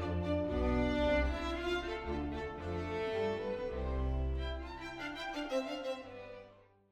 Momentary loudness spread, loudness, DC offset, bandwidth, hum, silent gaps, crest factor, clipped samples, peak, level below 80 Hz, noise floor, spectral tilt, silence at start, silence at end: 11 LU; -37 LUFS; under 0.1%; 9.8 kHz; none; none; 18 dB; under 0.1%; -20 dBFS; -42 dBFS; -60 dBFS; -6.5 dB/octave; 0 s; 0.3 s